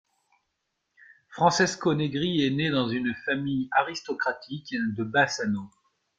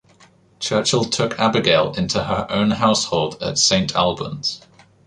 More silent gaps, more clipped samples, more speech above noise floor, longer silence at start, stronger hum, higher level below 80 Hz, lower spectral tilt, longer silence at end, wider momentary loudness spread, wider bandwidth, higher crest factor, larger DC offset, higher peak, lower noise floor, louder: neither; neither; first, 53 dB vs 33 dB; first, 1.3 s vs 0.6 s; neither; second, -64 dBFS vs -48 dBFS; about the same, -4.5 dB/octave vs -3.5 dB/octave; about the same, 0.5 s vs 0.5 s; about the same, 9 LU vs 8 LU; second, 9.2 kHz vs 11 kHz; about the same, 20 dB vs 18 dB; neither; second, -8 dBFS vs -2 dBFS; first, -79 dBFS vs -52 dBFS; second, -26 LUFS vs -19 LUFS